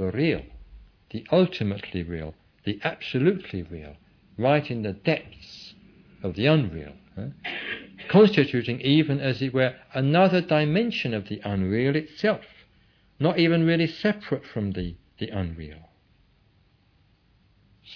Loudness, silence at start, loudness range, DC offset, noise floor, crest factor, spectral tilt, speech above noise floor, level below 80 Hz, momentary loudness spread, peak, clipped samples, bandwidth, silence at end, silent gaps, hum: -25 LUFS; 0 s; 7 LU; under 0.1%; -62 dBFS; 20 dB; -8 dB/octave; 38 dB; -52 dBFS; 18 LU; -6 dBFS; under 0.1%; 5.4 kHz; 0 s; none; none